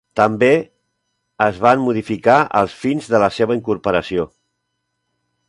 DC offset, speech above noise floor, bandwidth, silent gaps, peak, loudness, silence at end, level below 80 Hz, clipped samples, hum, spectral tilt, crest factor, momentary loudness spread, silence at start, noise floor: under 0.1%; 58 dB; 11.5 kHz; none; 0 dBFS; -17 LUFS; 1.2 s; -50 dBFS; under 0.1%; 60 Hz at -45 dBFS; -6.5 dB/octave; 18 dB; 8 LU; 0.15 s; -73 dBFS